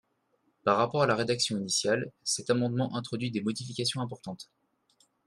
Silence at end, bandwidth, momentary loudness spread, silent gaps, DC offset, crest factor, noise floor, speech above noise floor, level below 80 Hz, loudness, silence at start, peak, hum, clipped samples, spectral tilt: 0.85 s; 13 kHz; 11 LU; none; under 0.1%; 22 dB; -73 dBFS; 44 dB; -70 dBFS; -29 LUFS; 0.65 s; -10 dBFS; none; under 0.1%; -4 dB/octave